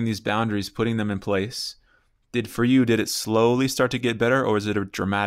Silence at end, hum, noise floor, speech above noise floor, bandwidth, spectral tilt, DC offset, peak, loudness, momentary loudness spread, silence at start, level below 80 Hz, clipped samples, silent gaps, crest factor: 0 s; none; -63 dBFS; 40 dB; 16 kHz; -5 dB/octave; under 0.1%; -6 dBFS; -23 LUFS; 9 LU; 0 s; -54 dBFS; under 0.1%; none; 16 dB